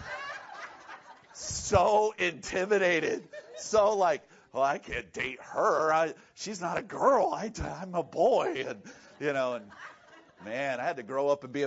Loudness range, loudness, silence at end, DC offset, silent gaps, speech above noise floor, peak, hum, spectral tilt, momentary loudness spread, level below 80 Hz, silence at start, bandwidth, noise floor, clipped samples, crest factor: 4 LU; -29 LUFS; 0 s; under 0.1%; none; 27 dB; -10 dBFS; none; -4 dB/octave; 19 LU; -56 dBFS; 0 s; 8 kHz; -56 dBFS; under 0.1%; 20 dB